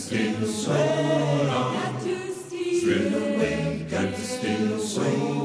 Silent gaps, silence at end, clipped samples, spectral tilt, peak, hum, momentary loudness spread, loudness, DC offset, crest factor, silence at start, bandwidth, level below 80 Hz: none; 0 s; under 0.1%; -5.5 dB/octave; -10 dBFS; none; 6 LU; -25 LUFS; under 0.1%; 14 dB; 0 s; 11 kHz; -56 dBFS